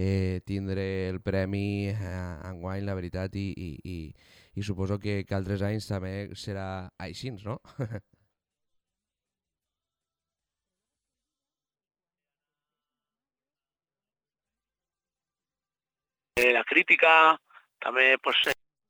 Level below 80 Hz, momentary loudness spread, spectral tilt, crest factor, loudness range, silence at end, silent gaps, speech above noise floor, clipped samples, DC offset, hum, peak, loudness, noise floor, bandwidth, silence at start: -58 dBFS; 18 LU; -5.5 dB/octave; 24 dB; 19 LU; 0.35 s; none; over 62 dB; under 0.1%; under 0.1%; none; -6 dBFS; -26 LUFS; under -90 dBFS; over 20 kHz; 0 s